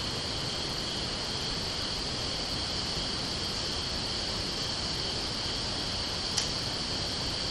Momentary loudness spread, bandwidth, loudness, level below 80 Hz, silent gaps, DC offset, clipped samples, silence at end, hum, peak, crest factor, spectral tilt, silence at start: 1 LU; 13 kHz; -31 LUFS; -46 dBFS; none; under 0.1%; under 0.1%; 0 s; none; -12 dBFS; 22 dB; -2.5 dB/octave; 0 s